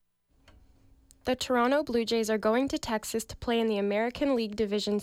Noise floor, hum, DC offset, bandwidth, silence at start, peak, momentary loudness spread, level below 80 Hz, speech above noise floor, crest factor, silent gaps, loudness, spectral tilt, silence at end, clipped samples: -63 dBFS; none; under 0.1%; 16.5 kHz; 1.25 s; -16 dBFS; 6 LU; -56 dBFS; 35 dB; 14 dB; none; -29 LUFS; -4 dB/octave; 0 s; under 0.1%